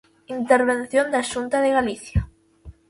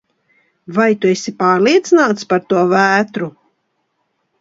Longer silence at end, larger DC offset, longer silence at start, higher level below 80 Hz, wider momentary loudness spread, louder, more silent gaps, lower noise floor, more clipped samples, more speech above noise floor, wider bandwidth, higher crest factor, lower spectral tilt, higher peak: second, 0.2 s vs 1.1 s; neither; second, 0.3 s vs 0.7 s; first, -38 dBFS vs -64 dBFS; about the same, 11 LU vs 10 LU; second, -21 LUFS vs -14 LUFS; neither; second, -46 dBFS vs -68 dBFS; neither; second, 25 dB vs 54 dB; first, 11.5 kHz vs 7.8 kHz; about the same, 20 dB vs 16 dB; about the same, -5.5 dB/octave vs -5 dB/octave; about the same, -2 dBFS vs 0 dBFS